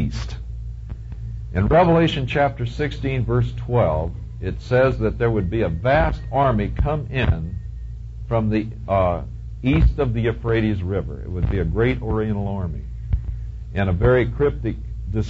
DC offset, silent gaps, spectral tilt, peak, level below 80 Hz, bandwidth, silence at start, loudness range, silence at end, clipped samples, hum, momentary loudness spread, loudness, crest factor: under 0.1%; none; -8.5 dB/octave; -4 dBFS; -28 dBFS; 7.6 kHz; 0 s; 3 LU; 0 s; under 0.1%; none; 15 LU; -21 LUFS; 16 dB